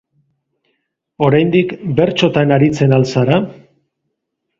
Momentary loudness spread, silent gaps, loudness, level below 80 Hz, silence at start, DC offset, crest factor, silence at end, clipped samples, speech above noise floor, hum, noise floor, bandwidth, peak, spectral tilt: 5 LU; none; -14 LUFS; -50 dBFS; 1.2 s; under 0.1%; 16 dB; 1.05 s; under 0.1%; 61 dB; none; -74 dBFS; 7.6 kHz; 0 dBFS; -7 dB/octave